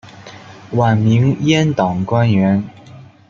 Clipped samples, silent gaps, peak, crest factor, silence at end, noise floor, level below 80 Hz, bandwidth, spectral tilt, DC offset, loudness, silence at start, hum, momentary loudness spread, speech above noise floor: under 0.1%; none; -2 dBFS; 14 dB; 0.25 s; -39 dBFS; -50 dBFS; 7.2 kHz; -7 dB/octave; under 0.1%; -15 LUFS; 0.05 s; none; 9 LU; 26 dB